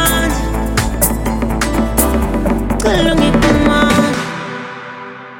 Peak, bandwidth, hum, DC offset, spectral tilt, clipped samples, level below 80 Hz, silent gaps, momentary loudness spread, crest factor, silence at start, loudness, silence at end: 0 dBFS; 17 kHz; none; under 0.1%; -4.5 dB/octave; under 0.1%; -22 dBFS; none; 13 LU; 14 dB; 0 s; -14 LUFS; 0 s